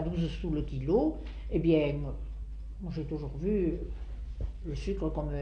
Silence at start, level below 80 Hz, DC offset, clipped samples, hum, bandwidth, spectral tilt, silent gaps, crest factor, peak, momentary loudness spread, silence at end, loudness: 0 s; -38 dBFS; under 0.1%; under 0.1%; none; 6.8 kHz; -9 dB/octave; none; 18 dB; -14 dBFS; 14 LU; 0 s; -33 LUFS